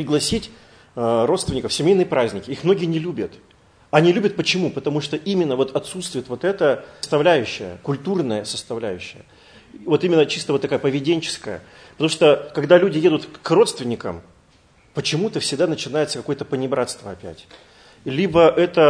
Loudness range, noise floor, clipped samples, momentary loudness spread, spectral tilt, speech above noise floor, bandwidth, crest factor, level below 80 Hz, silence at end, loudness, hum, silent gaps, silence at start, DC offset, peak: 5 LU; -54 dBFS; under 0.1%; 14 LU; -5 dB/octave; 35 dB; 11 kHz; 20 dB; -52 dBFS; 0 s; -20 LUFS; none; none; 0 s; under 0.1%; 0 dBFS